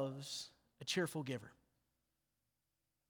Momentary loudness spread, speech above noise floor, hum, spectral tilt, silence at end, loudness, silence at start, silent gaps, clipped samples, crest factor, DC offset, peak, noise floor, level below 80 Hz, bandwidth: 13 LU; 45 dB; none; -4 dB/octave; 1.55 s; -43 LUFS; 0 s; none; under 0.1%; 20 dB; under 0.1%; -26 dBFS; -88 dBFS; -82 dBFS; over 20 kHz